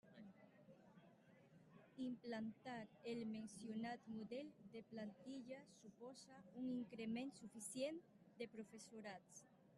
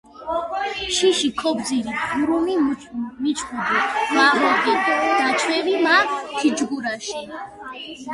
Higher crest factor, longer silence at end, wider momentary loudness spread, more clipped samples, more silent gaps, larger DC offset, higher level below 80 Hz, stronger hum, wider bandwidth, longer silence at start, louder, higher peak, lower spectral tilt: about the same, 18 dB vs 18 dB; about the same, 0 s vs 0 s; first, 17 LU vs 14 LU; neither; neither; neither; second, -90 dBFS vs -56 dBFS; neither; about the same, 12 kHz vs 11.5 kHz; about the same, 0.05 s vs 0.15 s; second, -53 LUFS vs -20 LUFS; second, -36 dBFS vs -2 dBFS; first, -4.5 dB/octave vs -2.5 dB/octave